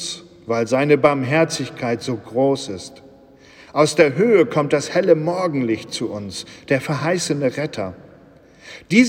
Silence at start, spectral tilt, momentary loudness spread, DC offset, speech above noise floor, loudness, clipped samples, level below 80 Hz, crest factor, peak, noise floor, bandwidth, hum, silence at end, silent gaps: 0 s; -5 dB/octave; 15 LU; under 0.1%; 29 dB; -19 LUFS; under 0.1%; -60 dBFS; 18 dB; -2 dBFS; -47 dBFS; 16 kHz; none; 0 s; none